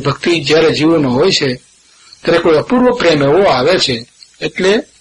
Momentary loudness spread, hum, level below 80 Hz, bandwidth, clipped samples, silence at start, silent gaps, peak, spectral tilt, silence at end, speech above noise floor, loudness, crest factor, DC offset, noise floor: 11 LU; none; -42 dBFS; 11.5 kHz; under 0.1%; 0 s; none; 0 dBFS; -5 dB/octave; 0.15 s; 32 dB; -12 LUFS; 12 dB; under 0.1%; -43 dBFS